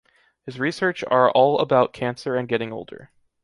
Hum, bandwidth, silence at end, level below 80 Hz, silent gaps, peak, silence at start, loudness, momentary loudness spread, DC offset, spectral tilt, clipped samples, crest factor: none; 11.5 kHz; 0.4 s; -64 dBFS; none; -2 dBFS; 0.45 s; -21 LUFS; 19 LU; under 0.1%; -6 dB/octave; under 0.1%; 20 dB